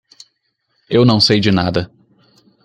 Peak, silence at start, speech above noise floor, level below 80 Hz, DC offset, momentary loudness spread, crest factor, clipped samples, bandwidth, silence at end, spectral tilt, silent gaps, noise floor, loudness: -2 dBFS; 0.9 s; 54 dB; -48 dBFS; under 0.1%; 11 LU; 16 dB; under 0.1%; 10.5 kHz; 0.8 s; -6 dB/octave; none; -67 dBFS; -13 LUFS